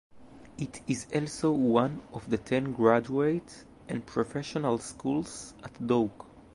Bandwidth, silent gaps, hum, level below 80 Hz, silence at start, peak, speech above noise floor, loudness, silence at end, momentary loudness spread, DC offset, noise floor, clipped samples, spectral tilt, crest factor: 11.5 kHz; none; none; -60 dBFS; 0.15 s; -8 dBFS; 19 dB; -30 LUFS; 0.15 s; 15 LU; under 0.1%; -48 dBFS; under 0.1%; -6 dB/octave; 22 dB